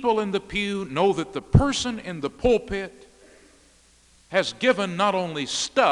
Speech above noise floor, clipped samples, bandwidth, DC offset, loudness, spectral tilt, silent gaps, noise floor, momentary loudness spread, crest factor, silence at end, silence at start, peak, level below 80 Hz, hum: 34 dB; under 0.1%; 11.5 kHz; under 0.1%; -24 LUFS; -5 dB/octave; none; -57 dBFS; 9 LU; 22 dB; 0 s; 0 s; -2 dBFS; -40 dBFS; none